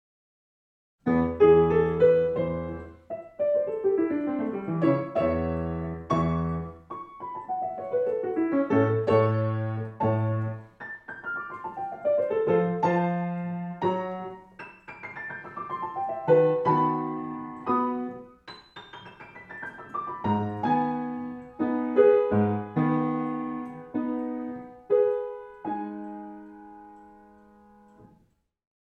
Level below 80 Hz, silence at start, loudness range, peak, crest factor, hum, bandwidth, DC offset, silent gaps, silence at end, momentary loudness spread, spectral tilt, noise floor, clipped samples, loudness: -54 dBFS; 1.05 s; 8 LU; -8 dBFS; 20 dB; none; 6.2 kHz; under 0.1%; none; 0.8 s; 20 LU; -9.5 dB/octave; -66 dBFS; under 0.1%; -26 LUFS